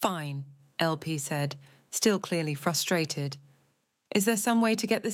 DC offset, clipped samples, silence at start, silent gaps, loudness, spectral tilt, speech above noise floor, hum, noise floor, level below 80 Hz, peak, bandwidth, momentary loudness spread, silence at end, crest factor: under 0.1%; under 0.1%; 0 s; none; -29 LUFS; -4 dB/octave; 44 dB; none; -72 dBFS; -76 dBFS; -10 dBFS; 17 kHz; 12 LU; 0 s; 20 dB